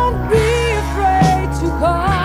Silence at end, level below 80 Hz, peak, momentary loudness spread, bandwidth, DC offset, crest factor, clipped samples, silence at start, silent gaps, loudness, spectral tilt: 0 s; -22 dBFS; -2 dBFS; 4 LU; 15.5 kHz; under 0.1%; 12 dB; under 0.1%; 0 s; none; -15 LUFS; -6 dB/octave